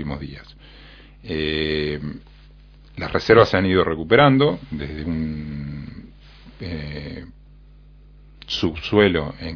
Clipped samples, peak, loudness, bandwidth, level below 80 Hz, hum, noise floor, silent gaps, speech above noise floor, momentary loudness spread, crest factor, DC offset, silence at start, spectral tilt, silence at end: under 0.1%; 0 dBFS; -20 LUFS; 5.4 kHz; -40 dBFS; 50 Hz at -45 dBFS; -46 dBFS; none; 26 dB; 22 LU; 22 dB; under 0.1%; 0 s; -7 dB/octave; 0 s